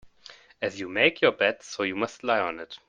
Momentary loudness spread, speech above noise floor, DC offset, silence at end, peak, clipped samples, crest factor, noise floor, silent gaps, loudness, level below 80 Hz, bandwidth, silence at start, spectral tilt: 11 LU; 25 dB; under 0.1%; 0.1 s; -4 dBFS; under 0.1%; 22 dB; -52 dBFS; none; -26 LUFS; -66 dBFS; 9.4 kHz; 0.05 s; -3.5 dB/octave